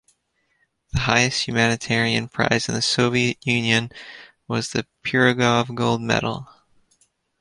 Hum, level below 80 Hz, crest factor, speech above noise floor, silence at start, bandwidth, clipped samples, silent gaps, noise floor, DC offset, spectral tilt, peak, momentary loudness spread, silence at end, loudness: none; -48 dBFS; 20 dB; 48 dB; 0.95 s; 11.5 kHz; under 0.1%; none; -69 dBFS; under 0.1%; -4 dB/octave; -2 dBFS; 10 LU; 0.95 s; -20 LUFS